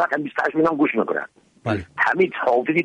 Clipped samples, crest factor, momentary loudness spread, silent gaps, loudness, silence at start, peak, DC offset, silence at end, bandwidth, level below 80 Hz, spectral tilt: under 0.1%; 16 dB; 9 LU; none; -21 LUFS; 0 s; -6 dBFS; under 0.1%; 0 s; 9.8 kHz; -58 dBFS; -7 dB/octave